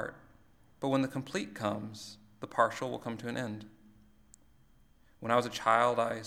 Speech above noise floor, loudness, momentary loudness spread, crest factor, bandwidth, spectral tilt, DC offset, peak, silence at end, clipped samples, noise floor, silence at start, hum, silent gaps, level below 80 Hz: 30 dB; -33 LUFS; 17 LU; 24 dB; 16 kHz; -5 dB/octave; under 0.1%; -10 dBFS; 0 s; under 0.1%; -62 dBFS; 0 s; none; none; -68 dBFS